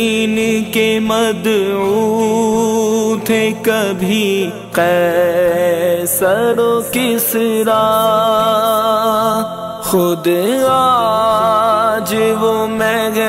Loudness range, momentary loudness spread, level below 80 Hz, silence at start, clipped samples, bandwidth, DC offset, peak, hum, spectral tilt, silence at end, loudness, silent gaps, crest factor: 1 LU; 3 LU; -50 dBFS; 0 s; under 0.1%; 16.5 kHz; under 0.1%; -2 dBFS; none; -4 dB/octave; 0 s; -14 LUFS; none; 10 dB